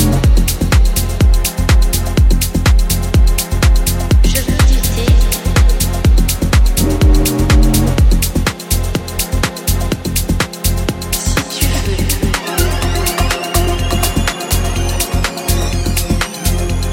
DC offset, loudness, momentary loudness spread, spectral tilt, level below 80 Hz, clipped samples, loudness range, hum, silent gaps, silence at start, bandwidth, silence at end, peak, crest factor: under 0.1%; -14 LUFS; 5 LU; -4.5 dB/octave; -14 dBFS; under 0.1%; 4 LU; none; none; 0 s; 17 kHz; 0 s; 0 dBFS; 12 dB